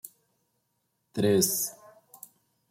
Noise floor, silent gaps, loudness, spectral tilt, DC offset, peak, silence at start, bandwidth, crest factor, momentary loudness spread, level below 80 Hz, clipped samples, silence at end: -77 dBFS; none; -26 LUFS; -4 dB/octave; under 0.1%; -10 dBFS; 0.05 s; 16.5 kHz; 22 dB; 25 LU; -70 dBFS; under 0.1%; 0.95 s